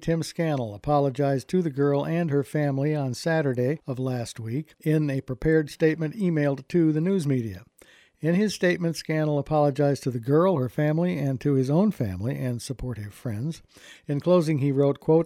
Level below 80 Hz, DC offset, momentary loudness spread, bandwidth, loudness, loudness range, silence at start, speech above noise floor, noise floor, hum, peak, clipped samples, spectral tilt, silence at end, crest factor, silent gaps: -52 dBFS; under 0.1%; 10 LU; 15 kHz; -25 LUFS; 3 LU; 0 s; 32 dB; -56 dBFS; none; -8 dBFS; under 0.1%; -7.5 dB/octave; 0 s; 16 dB; none